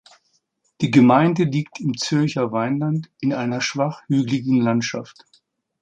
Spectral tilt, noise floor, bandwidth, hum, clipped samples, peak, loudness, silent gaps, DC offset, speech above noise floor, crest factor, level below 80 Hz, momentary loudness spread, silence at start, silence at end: -6 dB/octave; -68 dBFS; 8.8 kHz; none; under 0.1%; -2 dBFS; -20 LUFS; none; under 0.1%; 48 dB; 18 dB; -62 dBFS; 10 LU; 0.8 s; 0.7 s